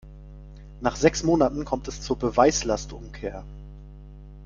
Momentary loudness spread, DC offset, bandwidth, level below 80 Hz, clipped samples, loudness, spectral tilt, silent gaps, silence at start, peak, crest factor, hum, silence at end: 25 LU; under 0.1%; 7.6 kHz; -40 dBFS; under 0.1%; -24 LUFS; -4.5 dB/octave; none; 0.05 s; -4 dBFS; 22 dB; 50 Hz at -40 dBFS; 0 s